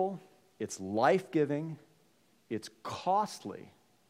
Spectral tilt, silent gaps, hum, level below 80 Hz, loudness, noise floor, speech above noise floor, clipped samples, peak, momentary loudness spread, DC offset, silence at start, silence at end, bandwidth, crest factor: -5.5 dB/octave; none; none; -82 dBFS; -33 LUFS; -69 dBFS; 36 dB; under 0.1%; -12 dBFS; 17 LU; under 0.1%; 0 s; 0.4 s; 16 kHz; 22 dB